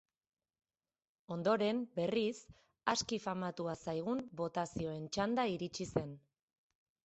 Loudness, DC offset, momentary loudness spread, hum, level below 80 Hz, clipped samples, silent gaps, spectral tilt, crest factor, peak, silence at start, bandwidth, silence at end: -38 LUFS; under 0.1%; 7 LU; none; -68 dBFS; under 0.1%; none; -5 dB/octave; 22 dB; -16 dBFS; 1.3 s; 8.2 kHz; 0.85 s